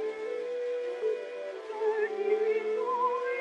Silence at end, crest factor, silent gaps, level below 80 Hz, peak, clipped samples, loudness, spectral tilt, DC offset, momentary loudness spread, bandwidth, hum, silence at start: 0 s; 14 dB; none; -88 dBFS; -16 dBFS; under 0.1%; -31 LUFS; -3.5 dB/octave; under 0.1%; 7 LU; 8.8 kHz; none; 0 s